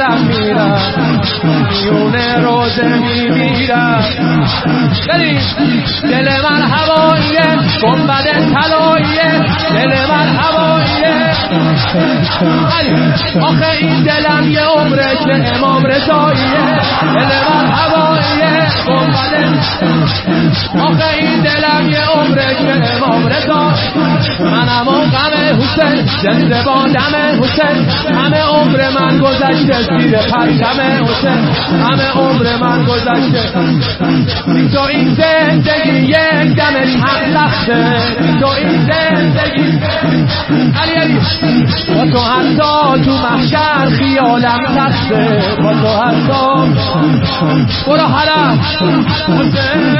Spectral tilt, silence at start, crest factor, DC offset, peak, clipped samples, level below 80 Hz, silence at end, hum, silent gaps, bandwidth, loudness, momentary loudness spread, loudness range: -9.5 dB/octave; 0 s; 10 dB; under 0.1%; 0 dBFS; under 0.1%; -36 dBFS; 0 s; none; none; 5.8 kHz; -10 LUFS; 2 LU; 1 LU